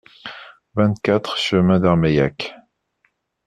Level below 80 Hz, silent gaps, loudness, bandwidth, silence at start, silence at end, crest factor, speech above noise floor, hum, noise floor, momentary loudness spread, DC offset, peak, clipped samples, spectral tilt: -48 dBFS; none; -18 LUFS; 9.6 kHz; 0.25 s; 0.9 s; 18 dB; 50 dB; none; -67 dBFS; 19 LU; under 0.1%; -2 dBFS; under 0.1%; -7 dB/octave